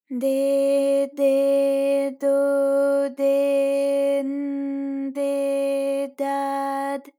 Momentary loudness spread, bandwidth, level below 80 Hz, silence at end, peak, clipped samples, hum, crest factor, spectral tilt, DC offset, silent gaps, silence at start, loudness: 7 LU; 16 kHz; under -90 dBFS; 0.15 s; -10 dBFS; under 0.1%; none; 10 dB; -3.5 dB/octave; under 0.1%; none; 0.1 s; -22 LUFS